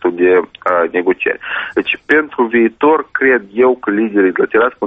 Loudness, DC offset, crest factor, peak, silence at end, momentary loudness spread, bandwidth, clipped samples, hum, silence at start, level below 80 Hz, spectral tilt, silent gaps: -14 LUFS; under 0.1%; 14 dB; 0 dBFS; 0 s; 5 LU; 3.9 kHz; under 0.1%; none; 0 s; -54 dBFS; -7.5 dB/octave; none